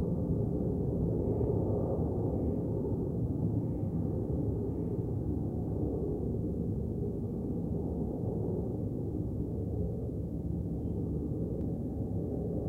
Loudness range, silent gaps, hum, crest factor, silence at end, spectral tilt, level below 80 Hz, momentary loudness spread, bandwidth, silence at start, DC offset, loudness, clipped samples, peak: 3 LU; none; none; 14 dB; 0 s; -12.5 dB/octave; -42 dBFS; 4 LU; 1.9 kHz; 0 s; under 0.1%; -34 LUFS; under 0.1%; -18 dBFS